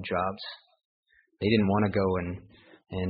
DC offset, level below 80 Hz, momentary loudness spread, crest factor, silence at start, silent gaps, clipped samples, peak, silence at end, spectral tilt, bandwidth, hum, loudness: under 0.1%; -56 dBFS; 18 LU; 20 dB; 0 s; 0.85-1.03 s; under 0.1%; -10 dBFS; 0 s; -5.5 dB/octave; 5 kHz; none; -28 LUFS